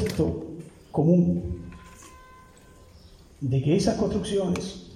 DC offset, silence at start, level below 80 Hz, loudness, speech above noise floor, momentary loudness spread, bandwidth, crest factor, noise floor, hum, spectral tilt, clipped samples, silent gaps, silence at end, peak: under 0.1%; 0 s; -46 dBFS; -25 LUFS; 27 dB; 22 LU; 12.5 kHz; 18 dB; -51 dBFS; none; -7 dB/octave; under 0.1%; none; 0 s; -8 dBFS